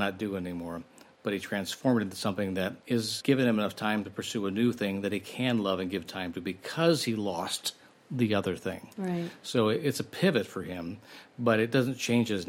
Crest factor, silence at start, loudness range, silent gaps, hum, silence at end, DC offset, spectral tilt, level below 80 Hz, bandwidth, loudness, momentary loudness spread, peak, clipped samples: 18 dB; 0 s; 2 LU; none; none; 0 s; under 0.1%; -5 dB/octave; -72 dBFS; 16.5 kHz; -30 LUFS; 11 LU; -12 dBFS; under 0.1%